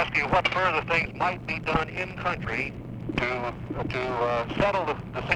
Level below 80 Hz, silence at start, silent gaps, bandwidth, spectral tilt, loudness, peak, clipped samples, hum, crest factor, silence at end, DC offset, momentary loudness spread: -44 dBFS; 0 s; none; 11.5 kHz; -6 dB/octave; -27 LUFS; -6 dBFS; under 0.1%; none; 22 dB; 0 s; under 0.1%; 9 LU